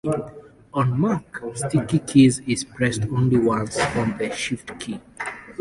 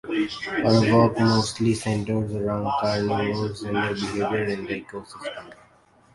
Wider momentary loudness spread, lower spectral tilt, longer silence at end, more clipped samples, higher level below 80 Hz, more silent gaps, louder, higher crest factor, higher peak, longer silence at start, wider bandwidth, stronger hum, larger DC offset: about the same, 15 LU vs 15 LU; about the same, -6 dB/octave vs -6 dB/octave; second, 0.05 s vs 0.6 s; neither; about the same, -50 dBFS vs -52 dBFS; neither; about the same, -22 LUFS vs -23 LUFS; about the same, 18 dB vs 20 dB; about the same, -4 dBFS vs -4 dBFS; about the same, 0.05 s vs 0.05 s; about the same, 11.5 kHz vs 11.5 kHz; neither; neither